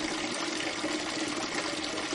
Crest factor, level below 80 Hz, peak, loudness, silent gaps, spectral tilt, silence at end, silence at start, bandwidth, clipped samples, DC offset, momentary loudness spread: 16 dB; -62 dBFS; -18 dBFS; -32 LUFS; none; -2 dB/octave; 0 s; 0 s; 11.5 kHz; under 0.1%; under 0.1%; 1 LU